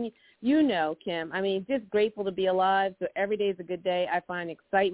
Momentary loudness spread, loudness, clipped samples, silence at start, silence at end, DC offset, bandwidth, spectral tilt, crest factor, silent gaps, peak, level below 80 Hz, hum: 9 LU; -28 LUFS; under 0.1%; 0 s; 0 s; under 0.1%; 4 kHz; -9 dB/octave; 16 dB; none; -12 dBFS; -68 dBFS; none